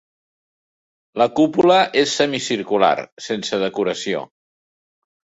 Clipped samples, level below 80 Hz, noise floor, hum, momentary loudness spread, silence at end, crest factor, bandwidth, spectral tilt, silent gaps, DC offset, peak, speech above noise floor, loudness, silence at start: under 0.1%; -62 dBFS; under -90 dBFS; none; 11 LU; 1.05 s; 18 dB; 8 kHz; -4 dB/octave; 3.12-3.17 s; under 0.1%; -2 dBFS; over 72 dB; -18 LUFS; 1.15 s